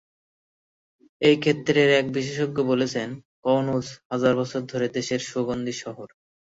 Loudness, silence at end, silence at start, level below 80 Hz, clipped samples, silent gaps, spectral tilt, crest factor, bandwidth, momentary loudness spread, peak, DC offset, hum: -24 LUFS; 0.5 s; 1.2 s; -62 dBFS; under 0.1%; 3.25-3.43 s, 4.05-4.10 s; -5 dB/octave; 20 dB; 8 kHz; 12 LU; -6 dBFS; under 0.1%; none